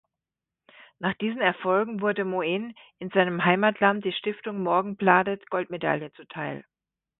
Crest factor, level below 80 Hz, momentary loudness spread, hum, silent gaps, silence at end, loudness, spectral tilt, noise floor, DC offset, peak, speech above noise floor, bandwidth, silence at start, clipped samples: 24 dB; -70 dBFS; 13 LU; none; none; 0.6 s; -25 LUFS; -10 dB/octave; -89 dBFS; under 0.1%; -2 dBFS; 64 dB; 4.1 kHz; 1 s; under 0.1%